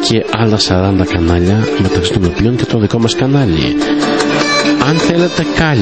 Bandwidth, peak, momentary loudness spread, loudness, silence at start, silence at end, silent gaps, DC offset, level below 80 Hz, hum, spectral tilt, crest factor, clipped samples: 8.8 kHz; 0 dBFS; 2 LU; -12 LUFS; 0 s; 0 s; none; 0.7%; -30 dBFS; none; -5.5 dB/octave; 12 dB; under 0.1%